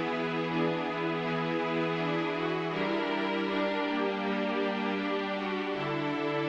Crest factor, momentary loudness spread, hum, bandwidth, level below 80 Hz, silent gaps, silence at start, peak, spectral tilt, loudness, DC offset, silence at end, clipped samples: 14 dB; 2 LU; none; 8.4 kHz; -70 dBFS; none; 0 s; -18 dBFS; -6.5 dB/octave; -31 LUFS; under 0.1%; 0 s; under 0.1%